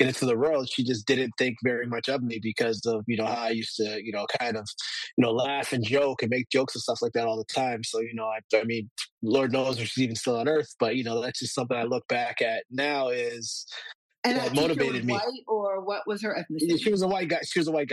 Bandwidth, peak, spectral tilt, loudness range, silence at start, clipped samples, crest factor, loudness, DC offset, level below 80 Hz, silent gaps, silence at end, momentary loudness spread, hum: 12.5 kHz; -8 dBFS; -4.5 dB/octave; 2 LU; 0 s; under 0.1%; 18 dB; -27 LUFS; under 0.1%; -70 dBFS; 5.13-5.17 s, 8.44-8.49 s, 8.91-8.96 s, 9.11-9.18 s, 13.95-14.09 s, 14.18-14.23 s; 0 s; 6 LU; none